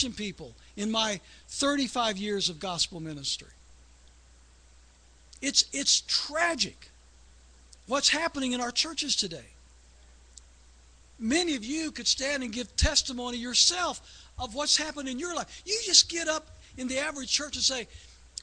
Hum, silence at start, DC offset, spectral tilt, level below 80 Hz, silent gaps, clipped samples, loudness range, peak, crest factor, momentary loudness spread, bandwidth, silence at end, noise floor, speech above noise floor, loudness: none; 0 s; under 0.1%; -1.5 dB/octave; -48 dBFS; none; under 0.1%; 6 LU; -4 dBFS; 26 dB; 14 LU; 10.5 kHz; 0 s; -57 dBFS; 28 dB; -27 LUFS